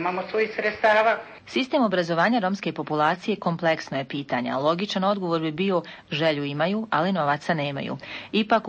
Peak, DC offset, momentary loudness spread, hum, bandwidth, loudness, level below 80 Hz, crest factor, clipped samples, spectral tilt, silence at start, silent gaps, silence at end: -8 dBFS; under 0.1%; 8 LU; none; 8.6 kHz; -24 LUFS; -66 dBFS; 16 dB; under 0.1%; -6 dB/octave; 0 s; none; 0 s